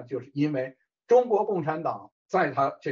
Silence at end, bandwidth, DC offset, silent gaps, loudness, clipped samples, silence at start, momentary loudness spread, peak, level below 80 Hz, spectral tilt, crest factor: 0 s; 7.2 kHz; under 0.1%; 2.12-2.29 s; -26 LUFS; under 0.1%; 0 s; 12 LU; -10 dBFS; -78 dBFS; -6 dB/octave; 16 dB